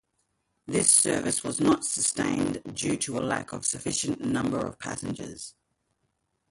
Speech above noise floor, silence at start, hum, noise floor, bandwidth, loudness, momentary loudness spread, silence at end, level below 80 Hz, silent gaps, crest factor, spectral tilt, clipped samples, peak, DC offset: 49 dB; 0.65 s; none; -76 dBFS; 11.5 kHz; -26 LUFS; 15 LU; 1 s; -58 dBFS; none; 22 dB; -3 dB/octave; under 0.1%; -6 dBFS; under 0.1%